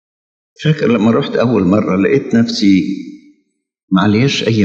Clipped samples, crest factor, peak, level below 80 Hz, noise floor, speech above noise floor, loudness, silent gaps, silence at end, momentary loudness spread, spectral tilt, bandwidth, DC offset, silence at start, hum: under 0.1%; 14 dB; 0 dBFS; -56 dBFS; -63 dBFS; 51 dB; -13 LUFS; 3.83-3.88 s; 0 s; 7 LU; -6.5 dB/octave; 7.8 kHz; under 0.1%; 0.6 s; none